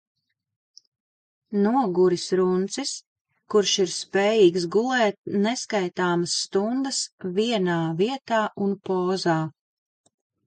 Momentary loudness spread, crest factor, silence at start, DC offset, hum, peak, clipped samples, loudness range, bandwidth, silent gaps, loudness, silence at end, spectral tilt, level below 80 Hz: 7 LU; 18 dB; 1.5 s; under 0.1%; none; -6 dBFS; under 0.1%; 3 LU; 9.4 kHz; 3.07-3.25 s, 5.18-5.24 s, 7.12-7.18 s; -23 LUFS; 0.95 s; -4.5 dB/octave; -72 dBFS